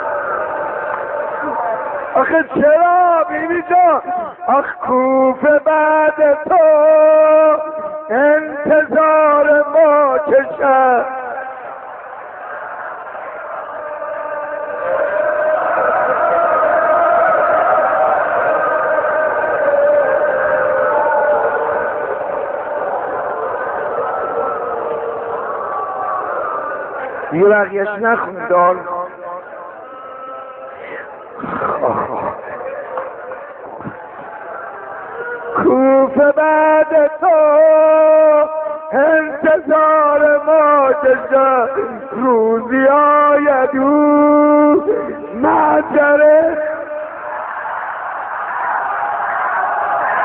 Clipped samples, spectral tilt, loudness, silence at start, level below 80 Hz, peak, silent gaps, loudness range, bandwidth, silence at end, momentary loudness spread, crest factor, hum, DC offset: under 0.1%; -4.5 dB/octave; -14 LUFS; 0 s; -56 dBFS; 0 dBFS; none; 11 LU; 3.6 kHz; 0 s; 17 LU; 14 dB; none; under 0.1%